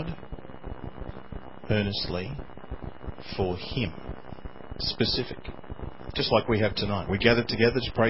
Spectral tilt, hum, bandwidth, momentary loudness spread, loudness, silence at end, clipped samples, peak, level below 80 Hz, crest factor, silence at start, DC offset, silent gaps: -9 dB/octave; none; 5.8 kHz; 19 LU; -27 LUFS; 0 s; under 0.1%; -4 dBFS; -42 dBFS; 26 dB; 0 s; 0.8%; none